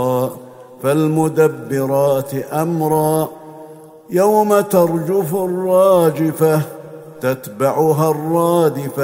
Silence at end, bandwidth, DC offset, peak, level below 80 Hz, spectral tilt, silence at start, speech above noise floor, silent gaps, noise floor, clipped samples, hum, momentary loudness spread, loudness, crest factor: 0 s; 16.5 kHz; under 0.1%; 0 dBFS; -60 dBFS; -7 dB/octave; 0 s; 23 dB; none; -38 dBFS; under 0.1%; none; 10 LU; -16 LUFS; 16 dB